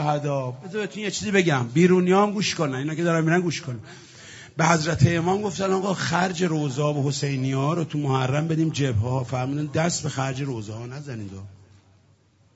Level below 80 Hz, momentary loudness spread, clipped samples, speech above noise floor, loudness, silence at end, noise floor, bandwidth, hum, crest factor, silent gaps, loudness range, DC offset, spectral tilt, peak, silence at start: -58 dBFS; 15 LU; under 0.1%; 36 dB; -23 LUFS; 1 s; -59 dBFS; 8 kHz; none; 22 dB; none; 5 LU; under 0.1%; -5.5 dB/octave; -2 dBFS; 0 s